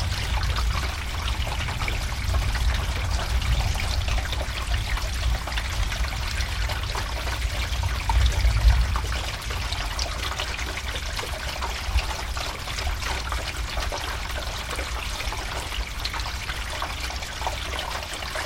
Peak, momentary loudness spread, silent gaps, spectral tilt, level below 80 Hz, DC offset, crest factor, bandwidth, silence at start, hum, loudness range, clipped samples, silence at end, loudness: -6 dBFS; 5 LU; none; -3.5 dB/octave; -28 dBFS; under 0.1%; 20 dB; 16.5 kHz; 0 s; none; 4 LU; under 0.1%; 0 s; -27 LUFS